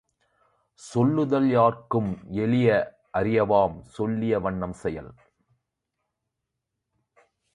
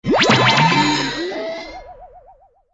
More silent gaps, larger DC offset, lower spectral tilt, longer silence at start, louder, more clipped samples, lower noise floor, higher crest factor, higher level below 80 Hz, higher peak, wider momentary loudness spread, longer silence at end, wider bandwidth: neither; neither; first, -8 dB/octave vs -4 dB/octave; first, 0.8 s vs 0.05 s; second, -24 LUFS vs -15 LUFS; neither; first, -83 dBFS vs -50 dBFS; about the same, 18 dB vs 18 dB; second, -54 dBFS vs -46 dBFS; second, -8 dBFS vs 0 dBFS; second, 10 LU vs 20 LU; first, 2.4 s vs 0.55 s; first, 11 kHz vs 8 kHz